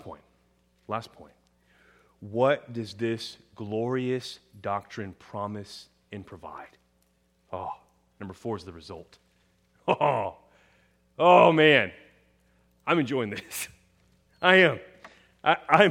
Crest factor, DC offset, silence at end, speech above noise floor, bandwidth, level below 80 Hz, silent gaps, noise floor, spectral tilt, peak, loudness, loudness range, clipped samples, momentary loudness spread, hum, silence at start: 26 dB; under 0.1%; 0 s; 43 dB; 16.5 kHz; -68 dBFS; none; -68 dBFS; -5 dB/octave; -2 dBFS; -25 LUFS; 17 LU; under 0.1%; 25 LU; none; 0.05 s